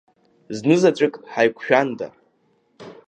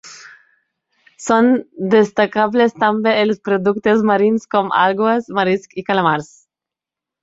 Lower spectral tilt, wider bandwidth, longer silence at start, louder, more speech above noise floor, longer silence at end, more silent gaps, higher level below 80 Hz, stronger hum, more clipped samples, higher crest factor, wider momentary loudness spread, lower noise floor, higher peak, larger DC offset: about the same, -6 dB/octave vs -5.5 dB/octave; first, 9.2 kHz vs 8 kHz; first, 0.5 s vs 0.05 s; second, -19 LUFS vs -16 LUFS; second, 45 dB vs 71 dB; second, 0.15 s vs 1 s; neither; second, -70 dBFS vs -60 dBFS; neither; neither; about the same, 20 dB vs 16 dB; first, 16 LU vs 5 LU; second, -64 dBFS vs -87 dBFS; about the same, -2 dBFS vs -2 dBFS; neither